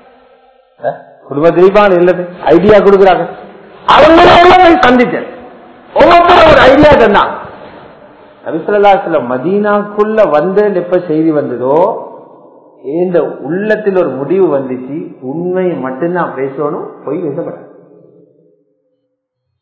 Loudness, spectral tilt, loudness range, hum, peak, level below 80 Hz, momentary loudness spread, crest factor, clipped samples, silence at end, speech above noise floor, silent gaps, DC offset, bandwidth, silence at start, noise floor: -8 LUFS; -6.5 dB/octave; 11 LU; none; 0 dBFS; -36 dBFS; 18 LU; 10 dB; 3%; 2 s; 60 dB; none; under 0.1%; 8 kHz; 0.8 s; -68 dBFS